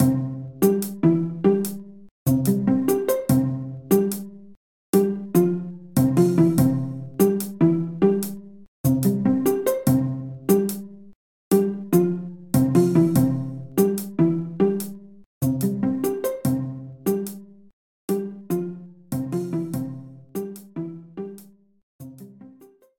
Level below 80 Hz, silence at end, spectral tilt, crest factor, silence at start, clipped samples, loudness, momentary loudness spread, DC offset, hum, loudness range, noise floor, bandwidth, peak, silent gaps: -56 dBFS; 0.5 s; -7.5 dB/octave; 18 dB; 0 s; under 0.1%; -22 LUFS; 16 LU; 0.2%; none; 9 LU; -51 dBFS; 19.5 kHz; -6 dBFS; 2.11-2.26 s, 4.57-4.93 s, 8.68-8.84 s, 11.15-11.51 s, 15.26-15.41 s, 17.73-18.08 s, 21.83-21.99 s